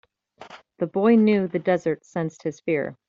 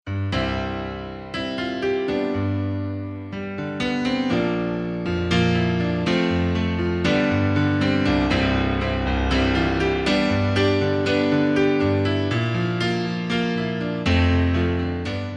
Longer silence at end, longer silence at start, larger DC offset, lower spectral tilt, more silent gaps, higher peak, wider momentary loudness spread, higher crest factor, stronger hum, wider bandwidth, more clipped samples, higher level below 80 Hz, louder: first, 0.15 s vs 0 s; first, 0.4 s vs 0.05 s; neither; about the same, -7.5 dB/octave vs -7 dB/octave; neither; about the same, -6 dBFS vs -8 dBFS; first, 12 LU vs 8 LU; about the same, 18 dB vs 14 dB; neither; second, 7.4 kHz vs 9.4 kHz; neither; second, -68 dBFS vs -36 dBFS; about the same, -23 LUFS vs -22 LUFS